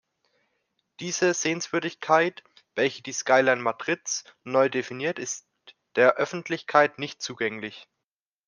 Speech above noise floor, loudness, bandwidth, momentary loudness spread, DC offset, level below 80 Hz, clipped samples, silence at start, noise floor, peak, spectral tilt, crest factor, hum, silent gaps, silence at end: 62 dB; -25 LUFS; 10.5 kHz; 12 LU; under 0.1%; -78 dBFS; under 0.1%; 1 s; -87 dBFS; -4 dBFS; -3 dB/octave; 22 dB; none; none; 0.65 s